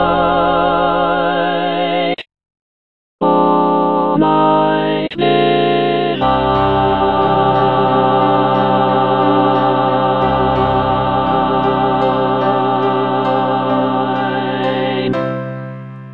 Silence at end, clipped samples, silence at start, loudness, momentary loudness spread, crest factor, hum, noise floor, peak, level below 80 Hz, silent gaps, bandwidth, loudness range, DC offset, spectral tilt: 0 s; under 0.1%; 0 s; -14 LUFS; 5 LU; 14 dB; none; under -90 dBFS; 0 dBFS; -38 dBFS; 2.61-3.19 s; 5.6 kHz; 3 LU; 0.8%; -9 dB/octave